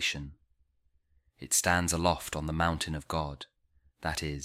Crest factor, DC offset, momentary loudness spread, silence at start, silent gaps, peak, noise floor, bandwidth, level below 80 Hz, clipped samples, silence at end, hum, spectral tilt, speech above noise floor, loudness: 22 dB; under 0.1%; 21 LU; 0 s; none; -10 dBFS; -71 dBFS; 16 kHz; -48 dBFS; under 0.1%; 0 s; none; -3 dB/octave; 40 dB; -30 LUFS